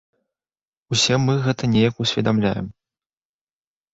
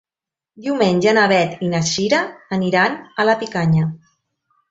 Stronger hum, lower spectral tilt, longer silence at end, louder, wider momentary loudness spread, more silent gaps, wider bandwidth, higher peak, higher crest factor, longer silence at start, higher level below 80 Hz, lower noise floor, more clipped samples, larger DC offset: neither; about the same, -5 dB/octave vs -5 dB/octave; first, 1.25 s vs 0.75 s; second, -20 LUFS vs -17 LUFS; second, 6 LU vs 9 LU; neither; about the same, 8 kHz vs 7.8 kHz; second, -6 dBFS vs -2 dBFS; about the same, 16 dB vs 16 dB; first, 0.9 s vs 0.6 s; first, -50 dBFS vs -56 dBFS; about the same, under -90 dBFS vs -89 dBFS; neither; neither